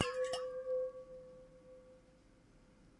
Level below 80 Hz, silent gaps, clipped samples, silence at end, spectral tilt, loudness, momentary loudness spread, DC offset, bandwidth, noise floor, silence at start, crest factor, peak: -70 dBFS; none; under 0.1%; 0.1 s; -3 dB/octave; -41 LUFS; 21 LU; under 0.1%; 11.5 kHz; -65 dBFS; 0 s; 28 dB; -16 dBFS